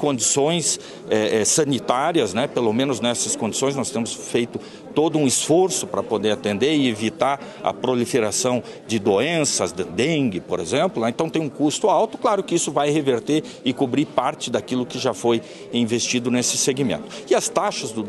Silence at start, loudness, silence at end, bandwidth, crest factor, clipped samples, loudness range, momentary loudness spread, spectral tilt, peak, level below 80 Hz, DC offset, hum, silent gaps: 0 s; -21 LUFS; 0 s; 12.5 kHz; 18 dB; under 0.1%; 2 LU; 6 LU; -3.5 dB/octave; -4 dBFS; -62 dBFS; under 0.1%; none; none